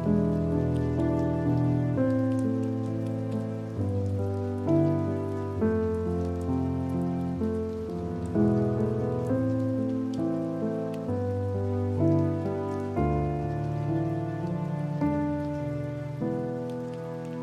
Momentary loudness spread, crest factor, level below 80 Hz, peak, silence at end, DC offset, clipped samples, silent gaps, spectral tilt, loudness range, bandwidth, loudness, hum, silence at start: 7 LU; 16 dB; -46 dBFS; -12 dBFS; 0 s; under 0.1%; under 0.1%; none; -9.5 dB/octave; 2 LU; 11.5 kHz; -29 LUFS; none; 0 s